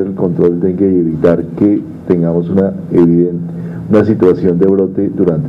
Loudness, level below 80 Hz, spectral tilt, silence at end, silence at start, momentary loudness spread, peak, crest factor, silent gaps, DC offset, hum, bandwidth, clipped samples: -12 LUFS; -44 dBFS; -11 dB/octave; 0 s; 0 s; 6 LU; 0 dBFS; 12 dB; none; under 0.1%; none; 5.4 kHz; under 0.1%